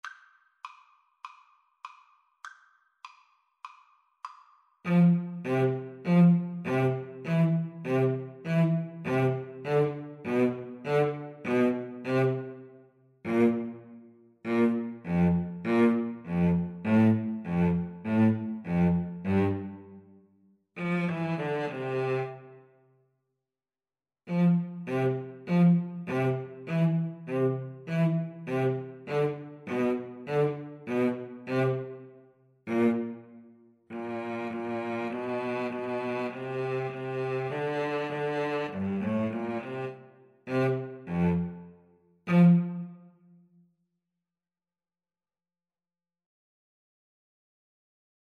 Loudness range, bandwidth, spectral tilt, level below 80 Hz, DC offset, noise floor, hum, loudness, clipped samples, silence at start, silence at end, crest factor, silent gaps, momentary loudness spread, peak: 6 LU; 6.4 kHz; -9 dB/octave; -62 dBFS; under 0.1%; under -90 dBFS; none; -29 LUFS; under 0.1%; 0.05 s; 5.25 s; 18 dB; none; 19 LU; -12 dBFS